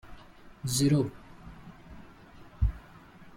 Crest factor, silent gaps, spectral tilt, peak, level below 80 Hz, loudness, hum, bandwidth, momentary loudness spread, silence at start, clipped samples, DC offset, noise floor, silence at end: 20 dB; none; -5.5 dB/octave; -14 dBFS; -40 dBFS; -29 LUFS; none; 16.5 kHz; 27 LU; 0.05 s; under 0.1%; under 0.1%; -52 dBFS; 0.1 s